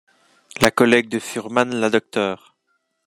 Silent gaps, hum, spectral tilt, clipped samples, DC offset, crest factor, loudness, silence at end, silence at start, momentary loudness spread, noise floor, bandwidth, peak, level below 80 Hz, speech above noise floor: none; none; -4 dB/octave; under 0.1%; under 0.1%; 20 dB; -19 LUFS; 0.7 s; 0.55 s; 10 LU; -70 dBFS; 13 kHz; 0 dBFS; -52 dBFS; 51 dB